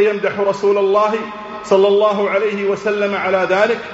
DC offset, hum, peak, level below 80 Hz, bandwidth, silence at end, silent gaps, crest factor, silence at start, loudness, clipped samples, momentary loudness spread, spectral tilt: under 0.1%; none; -2 dBFS; -58 dBFS; 8 kHz; 0 s; none; 14 dB; 0 s; -16 LUFS; under 0.1%; 5 LU; -3 dB/octave